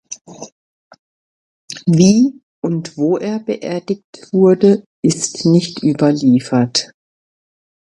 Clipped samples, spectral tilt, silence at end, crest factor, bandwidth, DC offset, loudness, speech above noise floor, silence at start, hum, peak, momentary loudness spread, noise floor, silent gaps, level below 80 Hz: under 0.1%; -6 dB/octave; 1.05 s; 16 dB; 11 kHz; under 0.1%; -15 LUFS; over 76 dB; 0.1 s; none; 0 dBFS; 15 LU; under -90 dBFS; 0.21-0.25 s, 0.52-0.91 s, 0.99-1.68 s, 2.43-2.62 s, 4.04-4.13 s, 4.86-5.03 s; -58 dBFS